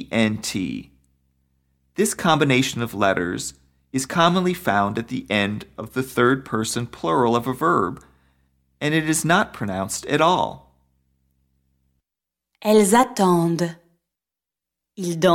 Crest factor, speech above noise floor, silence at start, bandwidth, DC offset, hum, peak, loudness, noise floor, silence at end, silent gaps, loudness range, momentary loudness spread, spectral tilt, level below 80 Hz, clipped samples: 20 dB; 68 dB; 0 s; 17.5 kHz; under 0.1%; none; -4 dBFS; -21 LUFS; -88 dBFS; 0 s; none; 2 LU; 11 LU; -4.5 dB/octave; -54 dBFS; under 0.1%